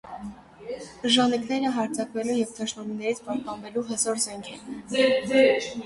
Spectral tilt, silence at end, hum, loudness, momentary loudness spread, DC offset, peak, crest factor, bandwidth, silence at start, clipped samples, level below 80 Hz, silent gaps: -3 dB/octave; 0 s; none; -25 LUFS; 18 LU; under 0.1%; -6 dBFS; 20 dB; 11.5 kHz; 0.05 s; under 0.1%; -62 dBFS; none